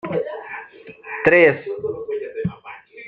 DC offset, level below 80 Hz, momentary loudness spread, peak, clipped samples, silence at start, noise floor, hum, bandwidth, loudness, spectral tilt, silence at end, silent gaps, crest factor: under 0.1%; -56 dBFS; 25 LU; -2 dBFS; under 0.1%; 0.05 s; -40 dBFS; none; 5.6 kHz; -19 LUFS; -8 dB/octave; 0 s; none; 20 dB